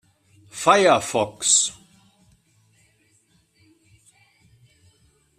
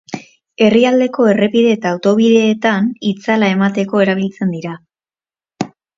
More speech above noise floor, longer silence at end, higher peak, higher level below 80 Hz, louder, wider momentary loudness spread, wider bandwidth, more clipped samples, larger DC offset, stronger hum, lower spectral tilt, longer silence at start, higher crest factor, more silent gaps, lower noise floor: second, 44 dB vs over 77 dB; first, 3.65 s vs 0.3 s; about the same, -2 dBFS vs 0 dBFS; second, -66 dBFS vs -60 dBFS; second, -18 LUFS vs -14 LUFS; second, 10 LU vs 15 LU; first, 14.5 kHz vs 7.6 kHz; neither; neither; neither; second, -1.5 dB/octave vs -6 dB/octave; first, 0.55 s vs 0.1 s; first, 22 dB vs 14 dB; neither; second, -63 dBFS vs under -90 dBFS